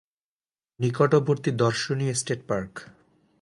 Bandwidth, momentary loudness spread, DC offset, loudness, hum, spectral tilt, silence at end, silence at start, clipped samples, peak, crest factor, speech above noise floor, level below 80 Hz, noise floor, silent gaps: 11.5 kHz; 9 LU; under 0.1%; -25 LUFS; none; -5.5 dB/octave; 0.55 s; 0.8 s; under 0.1%; -6 dBFS; 20 dB; over 66 dB; -60 dBFS; under -90 dBFS; none